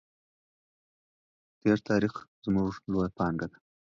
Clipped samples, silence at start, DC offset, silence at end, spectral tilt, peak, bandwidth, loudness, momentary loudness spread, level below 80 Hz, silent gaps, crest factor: under 0.1%; 1.65 s; under 0.1%; 0.5 s; -8 dB/octave; -12 dBFS; 7.4 kHz; -30 LUFS; 10 LU; -56 dBFS; 2.28-2.42 s; 20 dB